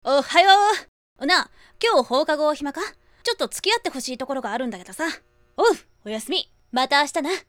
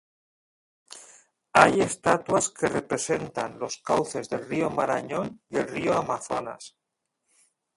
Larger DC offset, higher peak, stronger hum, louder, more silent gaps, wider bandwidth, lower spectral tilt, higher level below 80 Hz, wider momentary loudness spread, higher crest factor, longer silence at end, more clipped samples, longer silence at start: neither; about the same, 0 dBFS vs 0 dBFS; neither; first, -22 LUFS vs -26 LUFS; first, 0.88-1.16 s vs none; first, 18 kHz vs 11.5 kHz; second, -1.5 dB/octave vs -4 dB/octave; about the same, -60 dBFS vs -60 dBFS; second, 15 LU vs 20 LU; about the same, 22 dB vs 26 dB; second, 0.05 s vs 1.1 s; neither; second, 0.05 s vs 0.9 s